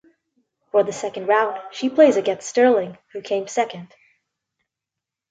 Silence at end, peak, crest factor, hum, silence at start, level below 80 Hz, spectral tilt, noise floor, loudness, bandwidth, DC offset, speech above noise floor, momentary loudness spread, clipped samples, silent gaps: 1.45 s; -2 dBFS; 20 dB; none; 0.75 s; -72 dBFS; -4 dB/octave; -86 dBFS; -20 LUFS; 9.2 kHz; under 0.1%; 66 dB; 12 LU; under 0.1%; none